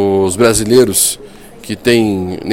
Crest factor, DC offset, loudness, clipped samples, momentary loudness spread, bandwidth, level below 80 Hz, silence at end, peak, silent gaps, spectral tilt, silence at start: 12 dB; 0.8%; -12 LUFS; under 0.1%; 11 LU; 17 kHz; -38 dBFS; 0 s; 0 dBFS; none; -4 dB/octave; 0 s